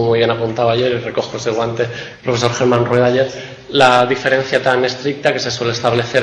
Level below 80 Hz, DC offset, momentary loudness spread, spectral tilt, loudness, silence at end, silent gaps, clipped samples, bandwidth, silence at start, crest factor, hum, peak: -50 dBFS; under 0.1%; 8 LU; -5 dB/octave; -15 LUFS; 0 s; none; under 0.1%; 10.5 kHz; 0 s; 16 dB; none; 0 dBFS